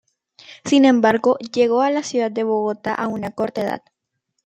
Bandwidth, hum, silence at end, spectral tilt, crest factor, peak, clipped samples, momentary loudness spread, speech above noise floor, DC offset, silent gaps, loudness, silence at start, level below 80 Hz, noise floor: 9 kHz; none; 0.65 s; -5 dB/octave; 18 dB; -2 dBFS; under 0.1%; 11 LU; 57 dB; under 0.1%; none; -19 LUFS; 0.5 s; -64 dBFS; -75 dBFS